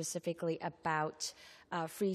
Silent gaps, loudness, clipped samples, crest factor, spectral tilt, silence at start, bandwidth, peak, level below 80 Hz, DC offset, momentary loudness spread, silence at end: none; -38 LUFS; under 0.1%; 18 dB; -4 dB/octave; 0 s; 14 kHz; -20 dBFS; -78 dBFS; under 0.1%; 7 LU; 0 s